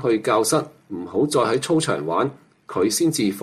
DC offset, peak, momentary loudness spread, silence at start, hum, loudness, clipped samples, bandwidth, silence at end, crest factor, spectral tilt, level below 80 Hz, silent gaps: under 0.1%; -6 dBFS; 8 LU; 0 s; none; -21 LUFS; under 0.1%; 14.5 kHz; 0 s; 14 dB; -4.5 dB/octave; -62 dBFS; none